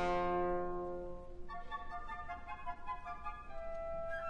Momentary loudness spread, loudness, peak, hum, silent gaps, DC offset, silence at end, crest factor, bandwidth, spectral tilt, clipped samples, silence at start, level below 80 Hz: 13 LU; -43 LUFS; -24 dBFS; none; none; 0.1%; 0 s; 16 dB; 8.2 kHz; -7 dB/octave; under 0.1%; 0 s; -50 dBFS